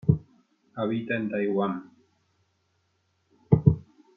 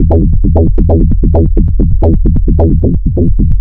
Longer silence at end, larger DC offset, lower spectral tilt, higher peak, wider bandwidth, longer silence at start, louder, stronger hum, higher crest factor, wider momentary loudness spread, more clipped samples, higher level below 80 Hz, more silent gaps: first, 0.35 s vs 0 s; neither; second, -11 dB/octave vs -14 dB/octave; second, -4 dBFS vs 0 dBFS; first, 4 kHz vs 1.6 kHz; about the same, 0.05 s vs 0 s; second, -27 LUFS vs -11 LUFS; neither; first, 24 dB vs 6 dB; first, 12 LU vs 2 LU; second, under 0.1% vs 1%; second, -52 dBFS vs -10 dBFS; neither